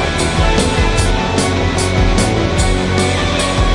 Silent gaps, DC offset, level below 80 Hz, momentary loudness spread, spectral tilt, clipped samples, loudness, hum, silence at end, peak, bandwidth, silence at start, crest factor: none; under 0.1%; -20 dBFS; 1 LU; -4.5 dB/octave; under 0.1%; -14 LUFS; none; 0 s; 0 dBFS; 11.5 kHz; 0 s; 12 dB